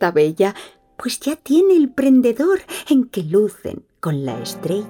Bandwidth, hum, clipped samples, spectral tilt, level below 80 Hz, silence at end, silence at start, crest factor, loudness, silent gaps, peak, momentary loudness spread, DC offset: 17.5 kHz; none; under 0.1%; -6 dB/octave; -58 dBFS; 0 s; 0 s; 14 dB; -18 LUFS; none; -4 dBFS; 13 LU; under 0.1%